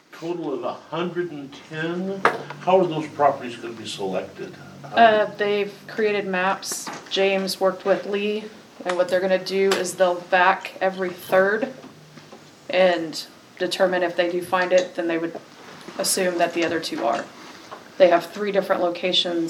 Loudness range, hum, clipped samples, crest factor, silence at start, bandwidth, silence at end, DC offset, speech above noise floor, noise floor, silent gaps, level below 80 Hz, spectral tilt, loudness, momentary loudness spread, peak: 3 LU; none; under 0.1%; 22 dB; 0.15 s; 16.5 kHz; 0 s; under 0.1%; 24 dB; -46 dBFS; none; -74 dBFS; -3.5 dB/octave; -22 LUFS; 15 LU; 0 dBFS